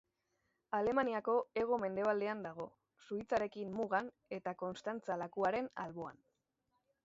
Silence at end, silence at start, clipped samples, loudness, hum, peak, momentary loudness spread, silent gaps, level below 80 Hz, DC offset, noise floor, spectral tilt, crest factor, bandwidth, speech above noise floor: 0.95 s; 0.7 s; under 0.1%; -39 LUFS; none; -20 dBFS; 11 LU; none; -74 dBFS; under 0.1%; -84 dBFS; -4.5 dB/octave; 20 dB; 7.6 kHz; 46 dB